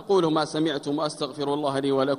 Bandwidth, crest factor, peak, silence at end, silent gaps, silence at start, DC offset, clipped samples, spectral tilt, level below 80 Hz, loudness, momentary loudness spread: 11.5 kHz; 16 dB; -10 dBFS; 0 s; none; 0 s; under 0.1%; under 0.1%; -5.5 dB/octave; -66 dBFS; -25 LUFS; 6 LU